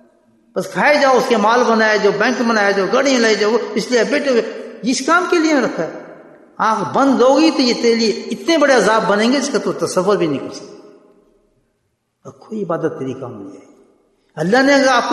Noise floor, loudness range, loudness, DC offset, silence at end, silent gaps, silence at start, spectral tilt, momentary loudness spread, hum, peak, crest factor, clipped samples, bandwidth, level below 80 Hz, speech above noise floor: -68 dBFS; 12 LU; -15 LUFS; under 0.1%; 0 s; none; 0.55 s; -4 dB/octave; 14 LU; none; 0 dBFS; 16 dB; under 0.1%; 12.5 kHz; -64 dBFS; 53 dB